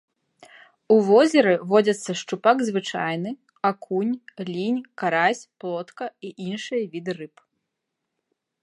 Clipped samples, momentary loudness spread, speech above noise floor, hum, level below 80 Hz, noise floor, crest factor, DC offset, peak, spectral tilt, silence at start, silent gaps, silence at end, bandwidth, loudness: under 0.1%; 16 LU; 59 dB; none; -78 dBFS; -81 dBFS; 20 dB; under 0.1%; -4 dBFS; -5 dB/octave; 0.9 s; none; 1.35 s; 11.5 kHz; -23 LUFS